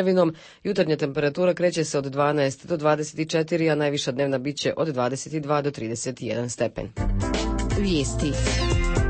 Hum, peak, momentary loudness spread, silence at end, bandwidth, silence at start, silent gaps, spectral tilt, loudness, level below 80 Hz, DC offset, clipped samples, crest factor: none; -8 dBFS; 7 LU; 0 s; 8.8 kHz; 0 s; none; -5.5 dB/octave; -25 LUFS; -34 dBFS; under 0.1%; under 0.1%; 16 dB